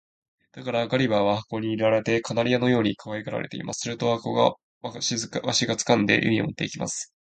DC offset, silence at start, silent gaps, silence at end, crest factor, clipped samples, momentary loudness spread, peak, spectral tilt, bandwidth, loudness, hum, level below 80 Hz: under 0.1%; 0.55 s; 4.63-4.81 s; 0.2 s; 22 dB; under 0.1%; 10 LU; -4 dBFS; -4.5 dB/octave; 9.4 kHz; -24 LUFS; none; -60 dBFS